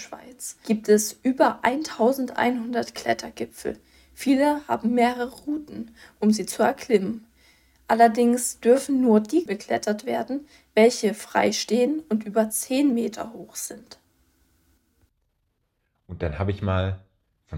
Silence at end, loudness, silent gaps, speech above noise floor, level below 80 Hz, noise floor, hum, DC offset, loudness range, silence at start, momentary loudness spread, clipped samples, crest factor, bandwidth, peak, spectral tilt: 0 s; -23 LUFS; none; 50 dB; -56 dBFS; -73 dBFS; none; under 0.1%; 10 LU; 0 s; 15 LU; under 0.1%; 20 dB; 17 kHz; -4 dBFS; -5 dB/octave